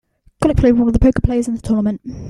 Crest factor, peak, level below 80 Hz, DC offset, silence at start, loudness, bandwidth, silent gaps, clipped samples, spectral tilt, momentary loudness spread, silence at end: 14 dB; -2 dBFS; -24 dBFS; under 0.1%; 0.4 s; -16 LUFS; 11.5 kHz; none; under 0.1%; -8 dB/octave; 7 LU; 0 s